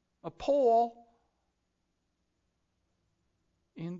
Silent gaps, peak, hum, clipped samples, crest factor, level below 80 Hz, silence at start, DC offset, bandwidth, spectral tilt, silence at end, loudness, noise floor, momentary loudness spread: none; -16 dBFS; none; under 0.1%; 18 dB; -68 dBFS; 0.25 s; under 0.1%; 7.6 kHz; -7.5 dB/octave; 0 s; -29 LUFS; -80 dBFS; 19 LU